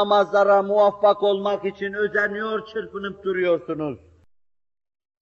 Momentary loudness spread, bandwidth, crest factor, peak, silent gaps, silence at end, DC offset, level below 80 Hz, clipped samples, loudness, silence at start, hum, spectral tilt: 13 LU; 7 kHz; 16 dB; -6 dBFS; none; 1.25 s; under 0.1%; -64 dBFS; under 0.1%; -21 LUFS; 0 s; none; -6 dB/octave